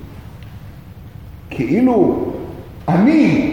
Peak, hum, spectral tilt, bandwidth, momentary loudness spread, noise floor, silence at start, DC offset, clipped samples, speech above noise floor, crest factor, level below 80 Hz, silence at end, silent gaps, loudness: 0 dBFS; none; -8.5 dB/octave; 16 kHz; 24 LU; -35 dBFS; 0 s; 0.3%; under 0.1%; 22 dB; 18 dB; -40 dBFS; 0 s; none; -15 LUFS